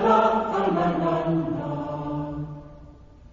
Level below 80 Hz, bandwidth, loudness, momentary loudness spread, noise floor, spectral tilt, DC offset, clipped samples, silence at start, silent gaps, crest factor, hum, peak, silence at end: -48 dBFS; 7.6 kHz; -25 LUFS; 14 LU; -47 dBFS; -8 dB/octave; under 0.1%; under 0.1%; 0 s; none; 18 dB; none; -8 dBFS; 0.05 s